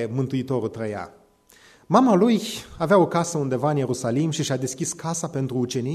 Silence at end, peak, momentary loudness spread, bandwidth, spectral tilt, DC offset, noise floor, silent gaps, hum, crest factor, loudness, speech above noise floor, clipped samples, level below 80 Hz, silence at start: 0 s; -4 dBFS; 11 LU; 13.5 kHz; -5.5 dB/octave; under 0.1%; -54 dBFS; none; none; 20 dB; -23 LUFS; 32 dB; under 0.1%; -58 dBFS; 0 s